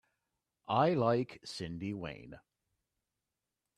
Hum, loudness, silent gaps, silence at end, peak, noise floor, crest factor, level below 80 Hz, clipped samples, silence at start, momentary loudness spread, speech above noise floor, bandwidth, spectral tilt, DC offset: none; -34 LUFS; none; 1.4 s; -16 dBFS; -89 dBFS; 22 dB; -68 dBFS; under 0.1%; 0.7 s; 21 LU; 55 dB; 12 kHz; -6.5 dB/octave; under 0.1%